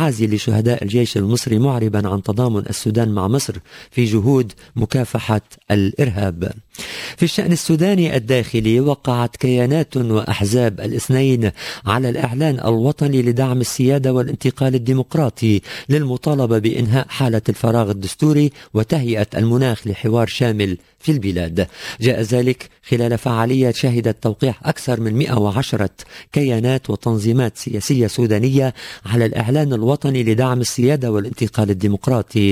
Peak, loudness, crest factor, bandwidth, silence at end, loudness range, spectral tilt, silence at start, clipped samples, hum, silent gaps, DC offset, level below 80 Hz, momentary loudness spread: 0 dBFS; -18 LUFS; 16 dB; 16 kHz; 0 s; 2 LU; -6.5 dB/octave; 0 s; under 0.1%; none; none; under 0.1%; -42 dBFS; 6 LU